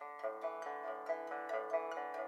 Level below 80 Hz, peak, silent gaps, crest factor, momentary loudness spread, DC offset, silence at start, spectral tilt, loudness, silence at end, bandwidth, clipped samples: under -90 dBFS; -24 dBFS; none; 18 dB; 5 LU; under 0.1%; 0 s; -3 dB/octave; -42 LUFS; 0 s; 14 kHz; under 0.1%